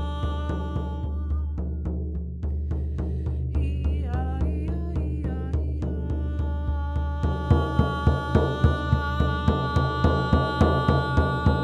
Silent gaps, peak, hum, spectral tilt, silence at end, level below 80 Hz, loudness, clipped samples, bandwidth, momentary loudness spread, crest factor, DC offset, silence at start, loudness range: none; -6 dBFS; none; -8 dB/octave; 0 s; -28 dBFS; -26 LUFS; under 0.1%; 6.2 kHz; 8 LU; 18 dB; under 0.1%; 0 s; 6 LU